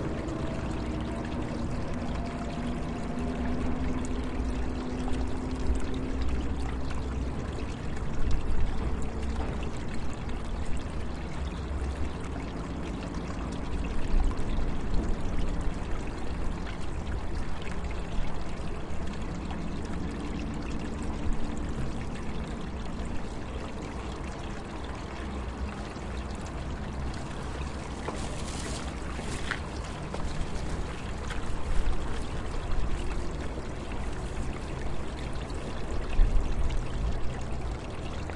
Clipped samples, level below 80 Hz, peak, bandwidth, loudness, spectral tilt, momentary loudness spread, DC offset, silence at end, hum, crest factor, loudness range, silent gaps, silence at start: under 0.1%; -34 dBFS; -12 dBFS; 11 kHz; -35 LUFS; -6 dB/octave; 5 LU; under 0.1%; 0 s; none; 18 dB; 3 LU; none; 0 s